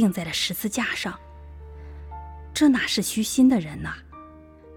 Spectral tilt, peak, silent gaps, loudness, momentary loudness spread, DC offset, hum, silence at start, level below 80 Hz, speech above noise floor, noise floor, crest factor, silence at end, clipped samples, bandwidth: -4 dB/octave; -8 dBFS; none; -23 LUFS; 24 LU; under 0.1%; none; 0 s; -46 dBFS; 24 dB; -47 dBFS; 16 dB; 0 s; under 0.1%; over 20 kHz